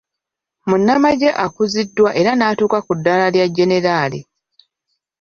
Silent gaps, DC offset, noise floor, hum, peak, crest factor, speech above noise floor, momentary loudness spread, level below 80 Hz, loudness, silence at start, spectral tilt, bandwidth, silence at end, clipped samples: none; under 0.1%; -82 dBFS; none; -2 dBFS; 14 dB; 68 dB; 6 LU; -56 dBFS; -15 LUFS; 0.65 s; -5.5 dB/octave; 7.4 kHz; 1 s; under 0.1%